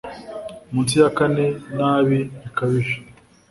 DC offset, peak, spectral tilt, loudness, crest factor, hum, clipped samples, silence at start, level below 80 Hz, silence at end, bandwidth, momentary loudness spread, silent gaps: under 0.1%; -2 dBFS; -6 dB/octave; -20 LUFS; 18 dB; none; under 0.1%; 0.05 s; -54 dBFS; 0.4 s; 11.5 kHz; 17 LU; none